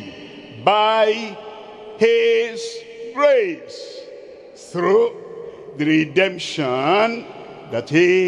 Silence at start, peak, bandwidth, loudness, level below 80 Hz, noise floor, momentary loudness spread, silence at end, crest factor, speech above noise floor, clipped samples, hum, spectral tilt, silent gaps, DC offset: 0 s; -2 dBFS; 11 kHz; -18 LUFS; -68 dBFS; -39 dBFS; 21 LU; 0 s; 18 dB; 22 dB; under 0.1%; none; -5 dB/octave; none; under 0.1%